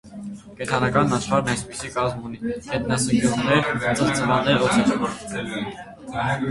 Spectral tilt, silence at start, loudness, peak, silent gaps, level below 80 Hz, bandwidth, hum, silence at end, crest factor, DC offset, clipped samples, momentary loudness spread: -5 dB/octave; 0.05 s; -22 LUFS; -4 dBFS; none; -48 dBFS; 11.5 kHz; none; 0 s; 20 dB; under 0.1%; under 0.1%; 13 LU